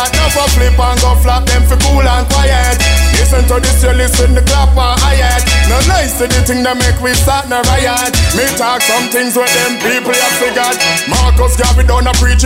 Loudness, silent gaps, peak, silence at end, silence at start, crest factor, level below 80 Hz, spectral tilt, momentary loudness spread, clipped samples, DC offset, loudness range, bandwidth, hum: -10 LUFS; none; -2 dBFS; 0 s; 0 s; 8 dB; -12 dBFS; -3.5 dB/octave; 2 LU; under 0.1%; under 0.1%; 1 LU; 16.5 kHz; none